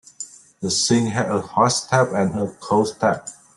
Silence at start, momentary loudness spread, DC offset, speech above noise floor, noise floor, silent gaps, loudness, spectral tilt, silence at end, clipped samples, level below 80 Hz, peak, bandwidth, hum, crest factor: 0.2 s; 12 LU; under 0.1%; 20 dB; -39 dBFS; none; -20 LUFS; -4 dB/octave; 0.25 s; under 0.1%; -58 dBFS; -4 dBFS; 12.5 kHz; none; 16 dB